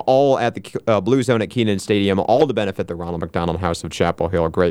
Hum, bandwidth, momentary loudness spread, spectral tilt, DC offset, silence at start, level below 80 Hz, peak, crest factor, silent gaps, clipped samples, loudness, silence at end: none; 15.5 kHz; 8 LU; -6 dB/octave; under 0.1%; 0 s; -44 dBFS; -2 dBFS; 16 dB; none; under 0.1%; -19 LUFS; 0 s